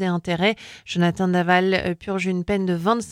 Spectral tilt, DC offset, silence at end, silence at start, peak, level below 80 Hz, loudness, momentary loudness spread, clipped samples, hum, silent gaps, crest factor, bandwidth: -6 dB/octave; under 0.1%; 0 s; 0 s; -6 dBFS; -50 dBFS; -22 LUFS; 7 LU; under 0.1%; none; none; 16 dB; 11.5 kHz